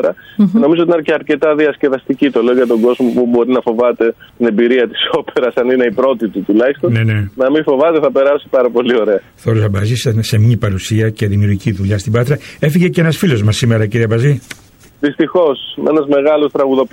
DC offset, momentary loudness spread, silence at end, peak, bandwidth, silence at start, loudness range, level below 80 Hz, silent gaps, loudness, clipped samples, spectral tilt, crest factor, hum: under 0.1%; 5 LU; 0.05 s; -2 dBFS; 16.5 kHz; 0 s; 1 LU; -46 dBFS; none; -13 LUFS; under 0.1%; -7 dB/octave; 10 dB; none